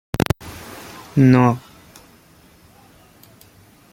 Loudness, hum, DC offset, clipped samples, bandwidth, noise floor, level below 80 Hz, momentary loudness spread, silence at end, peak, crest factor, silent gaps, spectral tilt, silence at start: -17 LUFS; none; under 0.1%; under 0.1%; 16.5 kHz; -50 dBFS; -46 dBFS; 23 LU; 2.35 s; -2 dBFS; 20 dB; none; -7.5 dB/octave; 0.15 s